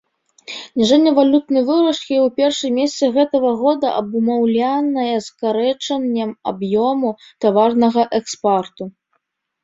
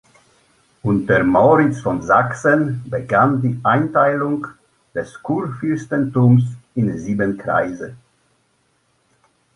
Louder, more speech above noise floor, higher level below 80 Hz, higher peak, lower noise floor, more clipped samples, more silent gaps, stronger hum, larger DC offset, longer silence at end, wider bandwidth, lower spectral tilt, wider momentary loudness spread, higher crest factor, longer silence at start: about the same, -17 LUFS vs -18 LUFS; first, 53 dB vs 46 dB; second, -62 dBFS vs -50 dBFS; about the same, -2 dBFS vs -2 dBFS; first, -69 dBFS vs -63 dBFS; neither; neither; neither; neither; second, 0.75 s vs 1.6 s; second, 7.8 kHz vs 11 kHz; second, -5 dB/octave vs -8.5 dB/octave; second, 8 LU vs 13 LU; about the same, 16 dB vs 16 dB; second, 0.5 s vs 0.85 s